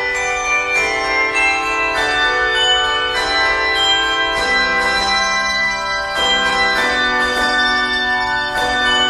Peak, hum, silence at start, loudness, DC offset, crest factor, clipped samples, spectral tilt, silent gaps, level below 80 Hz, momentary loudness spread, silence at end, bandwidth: -4 dBFS; none; 0 s; -14 LUFS; under 0.1%; 12 dB; under 0.1%; -1 dB/octave; none; -38 dBFS; 3 LU; 0 s; 13.5 kHz